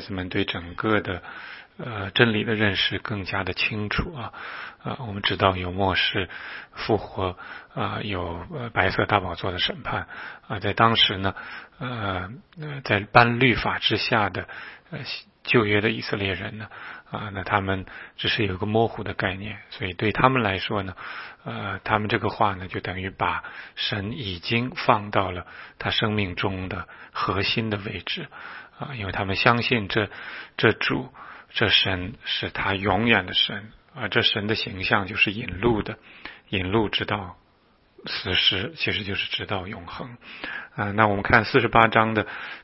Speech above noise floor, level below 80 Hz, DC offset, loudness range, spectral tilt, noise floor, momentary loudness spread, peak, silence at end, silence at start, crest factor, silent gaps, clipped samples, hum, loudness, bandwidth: 36 dB; -48 dBFS; under 0.1%; 4 LU; -8.5 dB/octave; -60 dBFS; 17 LU; 0 dBFS; 0 s; 0 s; 26 dB; none; under 0.1%; none; -24 LUFS; 5.8 kHz